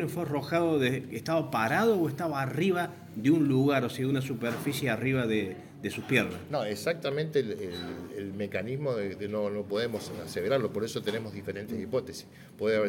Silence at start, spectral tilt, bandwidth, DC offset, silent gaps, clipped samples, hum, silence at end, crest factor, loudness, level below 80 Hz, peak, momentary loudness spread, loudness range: 0 s; -6 dB/octave; 17 kHz; under 0.1%; none; under 0.1%; none; 0 s; 20 dB; -30 LUFS; -66 dBFS; -8 dBFS; 11 LU; 5 LU